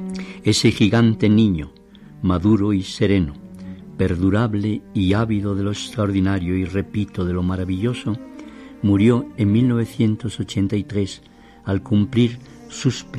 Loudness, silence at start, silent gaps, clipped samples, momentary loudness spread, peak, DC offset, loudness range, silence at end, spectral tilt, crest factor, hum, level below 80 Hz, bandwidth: -20 LUFS; 0 s; none; under 0.1%; 14 LU; -4 dBFS; under 0.1%; 4 LU; 0 s; -6.5 dB/octave; 16 dB; none; -44 dBFS; 12 kHz